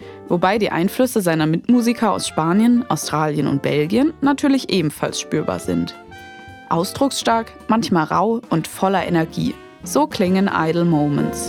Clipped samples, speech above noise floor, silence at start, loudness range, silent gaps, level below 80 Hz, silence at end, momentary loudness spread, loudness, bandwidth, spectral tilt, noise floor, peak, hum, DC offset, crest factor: under 0.1%; 20 dB; 0 s; 3 LU; none; -52 dBFS; 0 s; 7 LU; -19 LUFS; 18.5 kHz; -5.5 dB/octave; -38 dBFS; -2 dBFS; none; under 0.1%; 16 dB